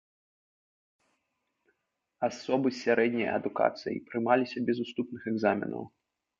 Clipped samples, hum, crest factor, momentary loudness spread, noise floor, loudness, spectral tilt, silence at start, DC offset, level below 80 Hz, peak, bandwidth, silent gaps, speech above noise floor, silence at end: under 0.1%; none; 22 dB; 9 LU; -81 dBFS; -30 LUFS; -6 dB/octave; 2.2 s; under 0.1%; -72 dBFS; -10 dBFS; 7.6 kHz; none; 51 dB; 0.55 s